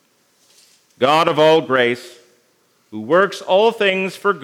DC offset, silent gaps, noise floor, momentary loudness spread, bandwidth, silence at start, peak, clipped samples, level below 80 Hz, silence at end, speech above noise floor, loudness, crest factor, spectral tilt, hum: under 0.1%; none; -60 dBFS; 9 LU; 16 kHz; 1 s; 0 dBFS; under 0.1%; -74 dBFS; 0 s; 44 dB; -16 LUFS; 18 dB; -4.5 dB/octave; none